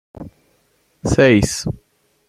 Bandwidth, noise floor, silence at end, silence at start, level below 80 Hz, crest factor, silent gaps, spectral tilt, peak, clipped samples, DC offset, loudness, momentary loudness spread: 14 kHz; -61 dBFS; 0.55 s; 0.2 s; -38 dBFS; 18 dB; none; -5.5 dB/octave; -2 dBFS; under 0.1%; under 0.1%; -16 LUFS; 25 LU